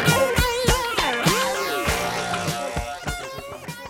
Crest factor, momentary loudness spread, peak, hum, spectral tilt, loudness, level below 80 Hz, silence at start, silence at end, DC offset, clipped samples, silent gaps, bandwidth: 20 dB; 11 LU; -2 dBFS; none; -3.5 dB/octave; -22 LUFS; -34 dBFS; 0 s; 0 s; under 0.1%; under 0.1%; none; 17 kHz